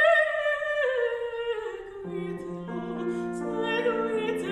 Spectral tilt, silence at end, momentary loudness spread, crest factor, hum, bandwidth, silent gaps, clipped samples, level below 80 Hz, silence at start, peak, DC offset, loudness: -5.5 dB/octave; 0 s; 10 LU; 16 dB; none; 12 kHz; none; under 0.1%; -60 dBFS; 0 s; -10 dBFS; under 0.1%; -28 LUFS